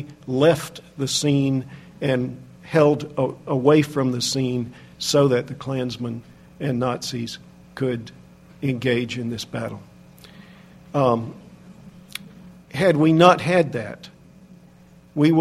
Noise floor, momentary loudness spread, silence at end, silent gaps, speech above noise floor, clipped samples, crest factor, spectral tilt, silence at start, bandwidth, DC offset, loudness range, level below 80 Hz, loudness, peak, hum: -49 dBFS; 19 LU; 0 s; none; 29 dB; under 0.1%; 22 dB; -5.5 dB/octave; 0 s; 15 kHz; under 0.1%; 8 LU; -56 dBFS; -21 LUFS; 0 dBFS; none